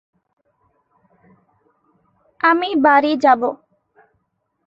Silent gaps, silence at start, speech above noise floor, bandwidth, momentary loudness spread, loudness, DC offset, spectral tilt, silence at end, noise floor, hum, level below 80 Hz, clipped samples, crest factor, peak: none; 2.45 s; 56 dB; 7.6 kHz; 9 LU; -16 LUFS; under 0.1%; -4.5 dB/octave; 1.1 s; -71 dBFS; none; -68 dBFS; under 0.1%; 20 dB; 0 dBFS